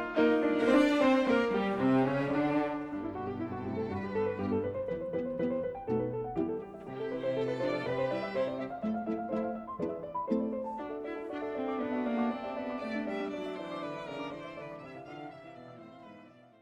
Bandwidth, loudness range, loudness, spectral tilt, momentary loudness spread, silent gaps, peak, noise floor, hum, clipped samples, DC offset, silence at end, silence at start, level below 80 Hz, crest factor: 10.5 kHz; 9 LU; -33 LUFS; -7 dB/octave; 16 LU; none; -14 dBFS; -55 dBFS; none; under 0.1%; under 0.1%; 0.3 s; 0 s; -62 dBFS; 18 dB